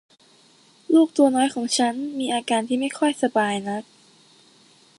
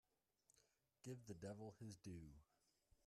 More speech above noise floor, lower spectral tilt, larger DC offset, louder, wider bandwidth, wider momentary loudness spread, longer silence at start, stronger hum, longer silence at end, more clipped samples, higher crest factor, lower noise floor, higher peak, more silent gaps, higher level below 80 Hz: first, 34 dB vs 27 dB; second, -3.5 dB/octave vs -6 dB/octave; neither; first, -22 LUFS vs -58 LUFS; second, 11.5 kHz vs 13.5 kHz; first, 9 LU vs 6 LU; first, 0.9 s vs 0.55 s; neither; first, 1.15 s vs 0.65 s; neither; about the same, 18 dB vs 18 dB; second, -55 dBFS vs -84 dBFS; first, -6 dBFS vs -42 dBFS; neither; about the same, -74 dBFS vs -78 dBFS